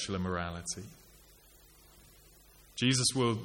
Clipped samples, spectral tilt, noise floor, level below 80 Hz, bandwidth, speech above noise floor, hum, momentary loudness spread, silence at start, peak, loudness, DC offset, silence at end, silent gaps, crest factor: under 0.1%; -3.5 dB/octave; -60 dBFS; -60 dBFS; 17 kHz; 27 dB; none; 17 LU; 0 s; -16 dBFS; -32 LUFS; under 0.1%; 0 s; none; 20 dB